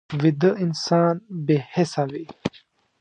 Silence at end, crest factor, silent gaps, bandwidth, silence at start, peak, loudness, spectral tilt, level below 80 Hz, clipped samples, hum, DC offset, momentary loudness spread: 0.5 s; 18 dB; none; 9.4 kHz; 0.1 s; -6 dBFS; -23 LUFS; -6.5 dB/octave; -60 dBFS; under 0.1%; none; under 0.1%; 12 LU